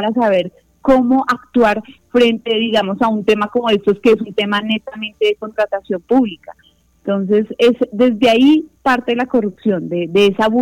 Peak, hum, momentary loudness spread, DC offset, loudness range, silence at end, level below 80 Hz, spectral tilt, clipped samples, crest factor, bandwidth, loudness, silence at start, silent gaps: -2 dBFS; none; 8 LU; under 0.1%; 3 LU; 0 s; -48 dBFS; -6 dB/octave; under 0.1%; 14 dB; 13 kHz; -15 LUFS; 0 s; none